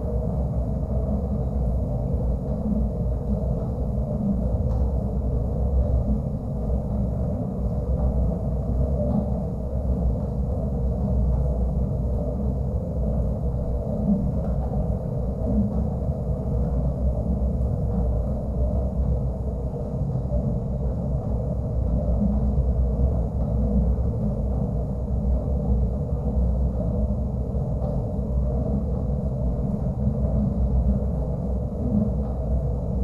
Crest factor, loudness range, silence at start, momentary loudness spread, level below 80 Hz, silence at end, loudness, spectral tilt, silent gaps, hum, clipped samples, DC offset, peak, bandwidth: 14 dB; 1 LU; 0 s; 4 LU; -26 dBFS; 0 s; -26 LUFS; -12 dB/octave; none; none; under 0.1%; under 0.1%; -10 dBFS; 1.6 kHz